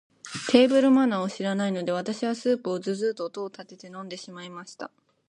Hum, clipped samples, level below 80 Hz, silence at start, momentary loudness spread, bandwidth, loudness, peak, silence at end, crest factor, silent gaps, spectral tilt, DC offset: none; under 0.1%; -72 dBFS; 0.25 s; 21 LU; 11 kHz; -24 LUFS; -2 dBFS; 0.4 s; 24 dB; none; -5.5 dB/octave; under 0.1%